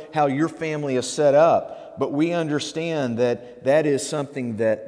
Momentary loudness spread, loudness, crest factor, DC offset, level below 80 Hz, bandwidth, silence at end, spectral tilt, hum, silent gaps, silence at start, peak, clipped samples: 10 LU; -22 LUFS; 16 dB; under 0.1%; -68 dBFS; 11 kHz; 0 s; -5.5 dB/octave; none; none; 0 s; -6 dBFS; under 0.1%